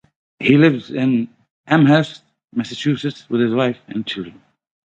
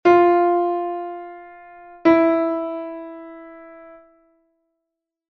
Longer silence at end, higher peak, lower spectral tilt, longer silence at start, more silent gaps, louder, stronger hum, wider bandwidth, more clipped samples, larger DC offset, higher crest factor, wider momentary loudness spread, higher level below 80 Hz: second, 0.55 s vs 1.45 s; first, 0 dBFS vs -4 dBFS; about the same, -7 dB/octave vs -7 dB/octave; first, 0.4 s vs 0.05 s; first, 1.51-1.64 s vs none; about the same, -18 LUFS vs -19 LUFS; neither; first, 8.2 kHz vs 6 kHz; neither; neither; about the same, 18 dB vs 18 dB; second, 15 LU vs 25 LU; about the same, -60 dBFS vs -62 dBFS